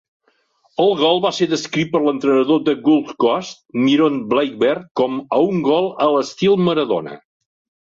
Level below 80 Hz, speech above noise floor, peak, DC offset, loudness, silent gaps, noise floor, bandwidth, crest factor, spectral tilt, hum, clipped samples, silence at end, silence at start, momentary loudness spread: -62 dBFS; 44 dB; -2 dBFS; under 0.1%; -17 LUFS; 4.91-4.95 s; -61 dBFS; 7.6 kHz; 16 dB; -5.5 dB/octave; none; under 0.1%; 0.75 s; 0.8 s; 6 LU